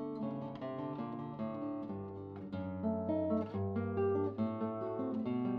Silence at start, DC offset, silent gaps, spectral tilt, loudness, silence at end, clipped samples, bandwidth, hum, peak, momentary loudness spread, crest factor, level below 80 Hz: 0 s; under 0.1%; none; -8.5 dB/octave; -39 LUFS; 0 s; under 0.1%; 5.2 kHz; none; -24 dBFS; 8 LU; 14 dB; -72 dBFS